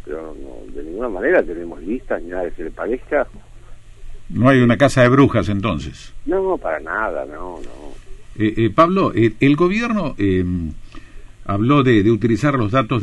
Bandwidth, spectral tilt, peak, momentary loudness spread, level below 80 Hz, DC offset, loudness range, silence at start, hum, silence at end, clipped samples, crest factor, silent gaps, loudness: 11.5 kHz; -7.5 dB/octave; -2 dBFS; 18 LU; -36 dBFS; under 0.1%; 6 LU; 0.05 s; none; 0 s; under 0.1%; 16 dB; none; -17 LUFS